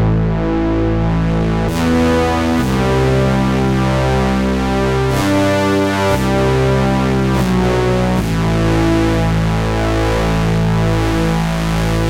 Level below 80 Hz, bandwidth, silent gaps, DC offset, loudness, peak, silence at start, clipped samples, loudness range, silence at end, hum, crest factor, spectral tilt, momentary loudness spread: -24 dBFS; 16.5 kHz; none; under 0.1%; -15 LUFS; -2 dBFS; 0 s; under 0.1%; 1 LU; 0 s; none; 12 dB; -6.5 dB/octave; 2 LU